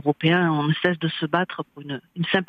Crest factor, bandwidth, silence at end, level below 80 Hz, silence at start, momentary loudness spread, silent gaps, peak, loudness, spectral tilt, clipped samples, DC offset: 18 dB; 5 kHz; 0.05 s; -66 dBFS; 0.05 s; 14 LU; none; -4 dBFS; -23 LUFS; -8.5 dB/octave; under 0.1%; under 0.1%